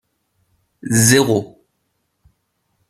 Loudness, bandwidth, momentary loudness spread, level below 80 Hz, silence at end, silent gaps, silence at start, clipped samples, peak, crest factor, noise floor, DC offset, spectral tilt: -14 LUFS; 15 kHz; 23 LU; -54 dBFS; 1.45 s; none; 0.85 s; under 0.1%; 0 dBFS; 20 dB; -70 dBFS; under 0.1%; -4 dB/octave